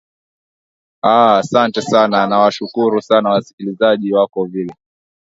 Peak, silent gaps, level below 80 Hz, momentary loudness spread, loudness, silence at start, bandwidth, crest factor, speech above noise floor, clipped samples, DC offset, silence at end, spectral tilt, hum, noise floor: 0 dBFS; 3.53-3.58 s; -62 dBFS; 10 LU; -14 LUFS; 1.05 s; 8 kHz; 16 dB; over 76 dB; under 0.1%; under 0.1%; 0.55 s; -5.5 dB/octave; none; under -90 dBFS